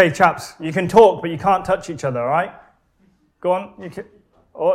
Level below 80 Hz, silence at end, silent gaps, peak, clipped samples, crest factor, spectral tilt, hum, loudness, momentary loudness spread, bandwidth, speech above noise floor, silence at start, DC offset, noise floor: -50 dBFS; 0 s; none; 0 dBFS; under 0.1%; 18 dB; -6 dB/octave; none; -18 LUFS; 19 LU; 14.5 kHz; 42 dB; 0 s; under 0.1%; -59 dBFS